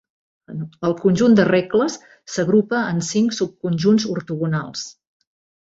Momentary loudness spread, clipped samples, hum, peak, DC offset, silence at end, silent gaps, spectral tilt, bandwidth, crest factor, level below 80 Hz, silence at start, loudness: 17 LU; under 0.1%; none; -4 dBFS; under 0.1%; 0.75 s; none; -6 dB/octave; 8 kHz; 16 dB; -58 dBFS; 0.5 s; -19 LUFS